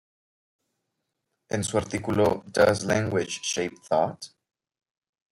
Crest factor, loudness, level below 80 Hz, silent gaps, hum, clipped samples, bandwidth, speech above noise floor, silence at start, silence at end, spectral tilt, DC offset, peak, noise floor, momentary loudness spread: 22 dB; -26 LUFS; -60 dBFS; none; none; under 0.1%; 16 kHz; 56 dB; 1.5 s; 1.05 s; -4.5 dB/octave; under 0.1%; -6 dBFS; -81 dBFS; 8 LU